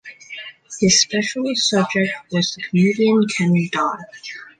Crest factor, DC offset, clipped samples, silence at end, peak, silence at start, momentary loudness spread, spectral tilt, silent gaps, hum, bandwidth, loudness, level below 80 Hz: 16 dB; under 0.1%; under 0.1%; 0.1 s; -4 dBFS; 0.05 s; 19 LU; -4 dB/octave; none; none; 9.6 kHz; -18 LUFS; -56 dBFS